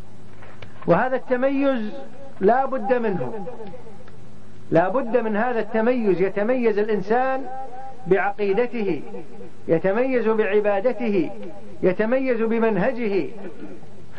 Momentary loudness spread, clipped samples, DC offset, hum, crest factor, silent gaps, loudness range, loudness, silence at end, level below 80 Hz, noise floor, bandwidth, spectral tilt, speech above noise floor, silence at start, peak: 18 LU; under 0.1%; 4%; none; 16 dB; none; 2 LU; -22 LUFS; 0 s; -60 dBFS; -45 dBFS; 6.6 kHz; -8.5 dB/octave; 23 dB; 0.15 s; -6 dBFS